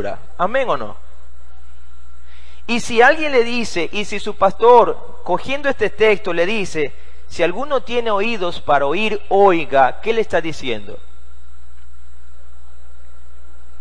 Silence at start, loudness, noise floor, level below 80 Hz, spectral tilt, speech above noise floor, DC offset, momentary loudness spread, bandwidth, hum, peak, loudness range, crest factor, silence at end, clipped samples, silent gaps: 0 s; -17 LUFS; -43 dBFS; -44 dBFS; -4.5 dB/octave; 26 dB; 10%; 13 LU; 10.5 kHz; none; 0 dBFS; 7 LU; 20 dB; 2.85 s; under 0.1%; none